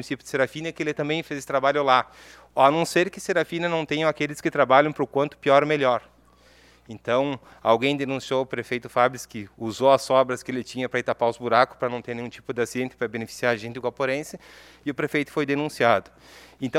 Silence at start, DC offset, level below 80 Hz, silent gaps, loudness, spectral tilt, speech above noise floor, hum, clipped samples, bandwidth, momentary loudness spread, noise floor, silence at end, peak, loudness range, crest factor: 0 s; under 0.1%; -62 dBFS; none; -24 LUFS; -5 dB/octave; 31 dB; none; under 0.1%; 15.5 kHz; 13 LU; -55 dBFS; 0 s; -2 dBFS; 4 LU; 22 dB